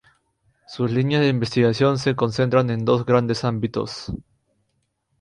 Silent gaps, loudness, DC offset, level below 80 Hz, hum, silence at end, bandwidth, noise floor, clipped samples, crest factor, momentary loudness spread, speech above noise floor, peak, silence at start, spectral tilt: none; -21 LUFS; under 0.1%; -50 dBFS; none; 1.05 s; 10.5 kHz; -72 dBFS; under 0.1%; 18 dB; 12 LU; 51 dB; -4 dBFS; 0.7 s; -7 dB/octave